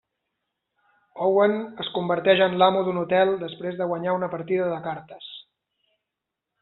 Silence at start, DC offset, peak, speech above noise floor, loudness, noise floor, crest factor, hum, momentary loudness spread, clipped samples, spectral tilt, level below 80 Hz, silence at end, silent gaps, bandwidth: 1.15 s; under 0.1%; -4 dBFS; 62 dB; -23 LUFS; -85 dBFS; 20 dB; none; 16 LU; under 0.1%; -3.5 dB/octave; -70 dBFS; 1.2 s; none; 4.2 kHz